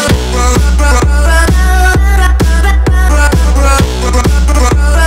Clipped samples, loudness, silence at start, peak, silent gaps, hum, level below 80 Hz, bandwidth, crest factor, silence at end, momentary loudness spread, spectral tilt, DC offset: 0.3%; -9 LUFS; 0 s; 0 dBFS; none; none; -8 dBFS; 15.5 kHz; 6 dB; 0 s; 2 LU; -5 dB/octave; under 0.1%